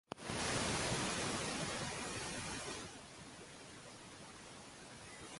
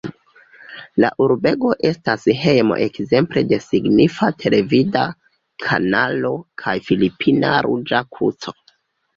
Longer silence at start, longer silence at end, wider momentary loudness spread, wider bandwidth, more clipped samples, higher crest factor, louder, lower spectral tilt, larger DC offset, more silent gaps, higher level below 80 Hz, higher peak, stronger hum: about the same, 0.1 s vs 0.05 s; second, 0 s vs 0.65 s; first, 16 LU vs 9 LU; first, 12 kHz vs 7.6 kHz; neither; about the same, 18 dB vs 16 dB; second, -40 LUFS vs -18 LUFS; second, -3 dB/octave vs -7 dB/octave; neither; neither; second, -62 dBFS vs -52 dBFS; second, -24 dBFS vs -2 dBFS; neither